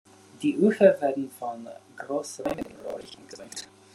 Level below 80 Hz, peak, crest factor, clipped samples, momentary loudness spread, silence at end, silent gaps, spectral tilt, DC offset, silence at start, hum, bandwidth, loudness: -66 dBFS; -6 dBFS; 22 dB; under 0.1%; 22 LU; 0.3 s; none; -5.5 dB/octave; under 0.1%; 0.4 s; none; 12.5 kHz; -26 LUFS